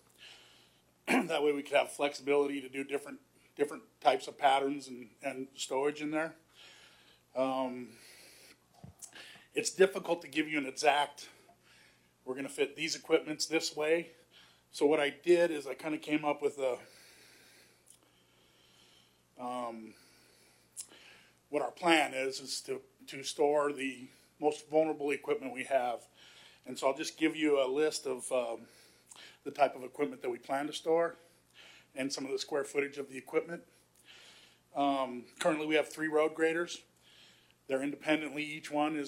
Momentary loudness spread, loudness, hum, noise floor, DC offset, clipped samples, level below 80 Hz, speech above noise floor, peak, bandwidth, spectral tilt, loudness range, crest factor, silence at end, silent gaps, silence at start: 19 LU; -33 LUFS; none; -67 dBFS; under 0.1%; under 0.1%; -82 dBFS; 34 dB; -12 dBFS; 16 kHz; -3.5 dB/octave; 7 LU; 24 dB; 0 s; none; 0.2 s